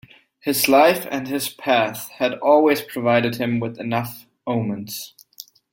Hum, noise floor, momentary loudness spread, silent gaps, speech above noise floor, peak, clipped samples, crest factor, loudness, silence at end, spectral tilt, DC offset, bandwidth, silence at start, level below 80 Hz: none; -45 dBFS; 17 LU; none; 25 dB; -2 dBFS; under 0.1%; 18 dB; -20 LUFS; 0.65 s; -4.5 dB/octave; under 0.1%; 17 kHz; 0.45 s; -62 dBFS